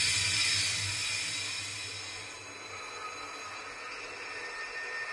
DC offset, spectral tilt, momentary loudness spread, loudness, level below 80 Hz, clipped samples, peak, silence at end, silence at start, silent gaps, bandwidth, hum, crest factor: under 0.1%; 0 dB/octave; 15 LU; -33 LUFS; -66 dBFS; under 0.1%; -16 dBFS; 0 s; 0 s; none; 11.5 kHz; none; 18 dB